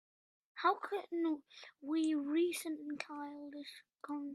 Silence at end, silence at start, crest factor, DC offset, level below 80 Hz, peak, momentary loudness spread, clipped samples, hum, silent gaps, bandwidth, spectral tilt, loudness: 0 s; 0.55 s; 20 dB; under 0.1%; under -90 dBFS; -18 dBFS; 16 LU; under 0.1%; none; none; 14 kHz; -2.5 dB/octave; -38 LUFS